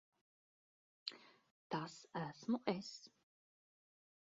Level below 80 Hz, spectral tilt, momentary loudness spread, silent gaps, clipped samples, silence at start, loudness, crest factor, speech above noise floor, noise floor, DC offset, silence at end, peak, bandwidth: -86 dBFS; -4.5 dB/octave; 16 LU; 1.51-1.70 s; under 0.1%; 1.05 s; -45 LUFS; 26 dB; over 46 dB; under -90 dBFS; under 0.1%; 1.25 s; -22 dBFS; 7.4 kHz